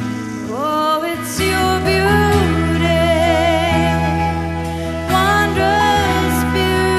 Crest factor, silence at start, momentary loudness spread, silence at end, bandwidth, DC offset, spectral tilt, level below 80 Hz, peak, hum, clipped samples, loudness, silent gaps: 14 dB; 0 s; 8 LU; 0 s; 14 kHz; under 0.1%; -5 dB/octave; -30 dBFS; -2 dBFS; none; under 0.1%; -16 LUFS; none